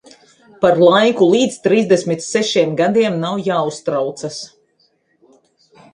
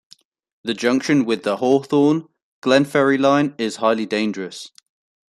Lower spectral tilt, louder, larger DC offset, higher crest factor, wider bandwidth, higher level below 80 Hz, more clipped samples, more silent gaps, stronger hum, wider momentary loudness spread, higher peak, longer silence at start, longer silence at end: about the same, -5 dB/octave vs -5.5 dB/octave; first, -15 LUFS vs -19 LUFS; neither; about the same, 16 dB vs 16 dB; about the same, 11 kHz vs 12 kHz; about the same, -60 dBFS vs -64 dBFS; neither; second, none vs 2.42-2.62 s; neither; about the same, 12 LU vs 13 LU; about the same, 0 dBFS vs -2 dBFS; about the same, 0.6 s vs 0.65 s; first, 1.5 s vs 0.6 s